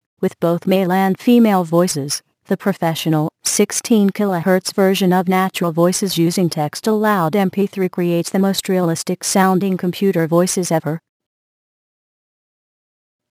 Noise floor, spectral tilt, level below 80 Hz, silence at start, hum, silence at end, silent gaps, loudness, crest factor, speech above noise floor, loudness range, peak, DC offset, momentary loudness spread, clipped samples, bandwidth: under -90 dBFS; -5 dB/octave; -64 dBFS; 0.2 s; none; 2.35 s; none; -17 LUFS; 14 dB; over 74 dB; 3 LU; -2 dBFS; under 0.1%; 6 LU; under 0.1%; 15.5 kHz